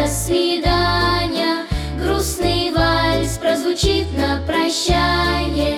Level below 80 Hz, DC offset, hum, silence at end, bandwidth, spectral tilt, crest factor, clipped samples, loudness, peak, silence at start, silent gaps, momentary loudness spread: -26 dBFS; under 0.1%; none; 0 s; 17.5 kHz; -4.5 dB/octave; 14 dB; under 0.1%; -18 LUFS; -4 dBFS; 0 s; none; 4 LU